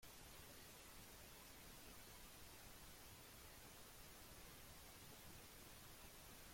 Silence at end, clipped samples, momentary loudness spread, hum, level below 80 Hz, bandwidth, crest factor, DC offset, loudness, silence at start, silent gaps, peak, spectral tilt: 0 s; under 0.1%; 1 LU; none; -70 dBFS; 16.5 kHz; 14 dB; under 0.1%; -60 LUFS; 0 s; none; -48 dBFS; -2.5 dB/octave